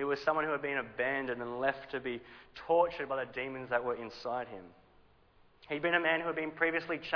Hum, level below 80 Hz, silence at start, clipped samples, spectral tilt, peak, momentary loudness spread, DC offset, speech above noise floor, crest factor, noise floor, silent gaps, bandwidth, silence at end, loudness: none; -68 dBFS; 0 s; under 0.1%; -6 dB/octave; -14 dBFS; 11 LU; under 0.1%; 30 dB; 20 dB; -64 dBFS; none; 5.4 kHz; 0 s; -34 LUFS